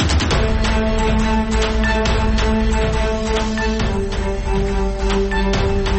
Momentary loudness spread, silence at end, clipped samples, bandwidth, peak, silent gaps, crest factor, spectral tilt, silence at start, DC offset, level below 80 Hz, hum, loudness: 4 LU; 0 s; under 0.1%; 8.8 kHz; -6 dBFS; none; 10 dB; -5.5 dB/octave; 0 s; under 0.1%; -20 dBFS; none; -19 LUFS